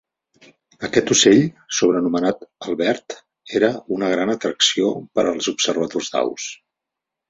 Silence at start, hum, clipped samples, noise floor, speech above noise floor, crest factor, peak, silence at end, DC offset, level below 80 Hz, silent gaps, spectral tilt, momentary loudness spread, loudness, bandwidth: 0.8 s; none; under 0.1%; -84 dBFS; 65 dB; 18 dB; -2 dBFS; 0.75 s; under 0.1%; -60 dBFS; none; -3 dB/octave; 14 LU; -19 LUFS; 8 kHz